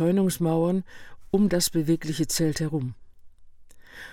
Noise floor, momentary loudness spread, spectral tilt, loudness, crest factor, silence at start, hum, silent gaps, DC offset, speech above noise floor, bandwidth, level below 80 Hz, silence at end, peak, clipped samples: -46 dBFS; 10 LU; -5.5 dB/octave; -25 LUFS; 16 dB; 0 s; none; none; under 0.1%; 22 dB; 17.5 kHz; -50 dBFS; 0 s; -10 dBFS; under 0.1%